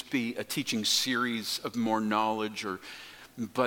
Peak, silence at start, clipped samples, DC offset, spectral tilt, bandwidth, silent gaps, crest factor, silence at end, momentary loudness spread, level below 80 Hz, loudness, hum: -12 dBFS; 0 s; under 0.1%; under 0.1%; -3 dB/octave; 17.5 kHz; none; 18 dB; 0 s; 14 LU; -70 dBFS; -30 LUFS; none